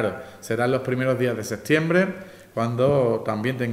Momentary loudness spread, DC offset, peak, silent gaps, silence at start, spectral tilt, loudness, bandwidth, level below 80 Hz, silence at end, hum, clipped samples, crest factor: 10 LU; under 0.1%; -6 dBFS; none; 0 s; -6.5 dB/octave; -23 LUFS; 16 kHz; -60 dBFS; 0 s; none; under 0.1%; 16 dB